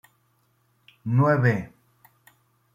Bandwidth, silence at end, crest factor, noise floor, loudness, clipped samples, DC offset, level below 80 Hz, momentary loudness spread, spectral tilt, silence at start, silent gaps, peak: 14 kHz; 1.1 s; 20 dB; -67 dBFS; -22 LUFS; under 0.1%; under 0.1%; -62 dBFS; 19 LU; -9.5 dB/octave; 1.05 s; none; -8 dBFS